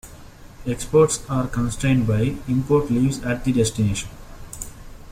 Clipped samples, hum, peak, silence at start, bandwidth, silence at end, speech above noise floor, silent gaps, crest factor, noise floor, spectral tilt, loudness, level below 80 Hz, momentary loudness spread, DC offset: under 0.1%; none; -4 dBFS; 0.05 s; 16 kHz; 0 s; 22 dB; none; 18 dB; -42 dBFS; -6 dB/octave; -21 LUFS; -38 dBFS; 17 LU; under 0.1%